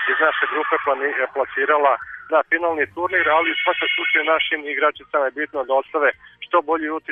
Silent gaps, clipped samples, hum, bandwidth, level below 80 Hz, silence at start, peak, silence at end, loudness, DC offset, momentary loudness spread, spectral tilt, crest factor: none; under 0.1%; none; 3.9 kHz; -64 dBFS; 0 s; -6 dBFS; 0 s; -19 LUFS; under 0.1%; 5 LU; -5.5 dB/octave; 14 dB